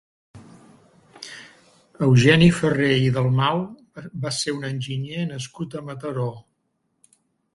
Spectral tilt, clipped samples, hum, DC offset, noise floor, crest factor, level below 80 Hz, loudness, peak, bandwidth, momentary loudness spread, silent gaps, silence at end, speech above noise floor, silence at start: -6 dB/octave; under 0.1%; none; under 0.1%; -72 dBFS; 20 dB; -52 dBFS; -21 LUFS; -2 dBFS; 11.5 kHz; 23 LU; none; 1.15 s; 52 dB; 0.35 s